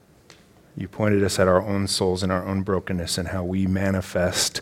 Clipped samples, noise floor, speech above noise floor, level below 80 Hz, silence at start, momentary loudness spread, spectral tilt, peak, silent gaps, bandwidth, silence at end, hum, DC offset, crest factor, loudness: under 0.1%; -52 dBFS; 30 dB; -48 dBFS; 0.75 s; 6 LU; -4.5 dB/octave; -2 dBFS; none; 16.5 kHz; 0 s; none; under 0.1%; 20 dB; -23 LUFS